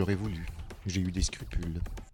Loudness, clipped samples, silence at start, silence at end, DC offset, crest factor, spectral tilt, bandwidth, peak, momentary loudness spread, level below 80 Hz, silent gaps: -35 LUFS; under 0.1%; 0 s; 0 s; under 0.1%; 16 dB; -5 dB/octave; 17 kHz; -16 dBFS; 9 LU; -38 dBFS; none